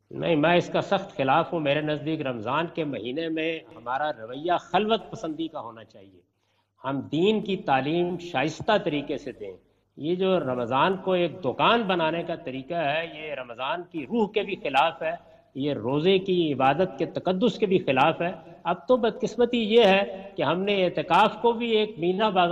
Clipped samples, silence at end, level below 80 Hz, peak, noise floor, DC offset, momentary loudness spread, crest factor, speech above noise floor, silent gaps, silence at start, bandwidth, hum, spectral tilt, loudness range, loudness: under 0.1%; 0 s; -62 dBFS; -8 dBFS; -69 dBFS; under 0.1%; 11 LU; 18 dB; 44 dB; none; 0.15 s; 9.2 kHz; none; -6.5 dB/octave; 6 LU; -25 LUFS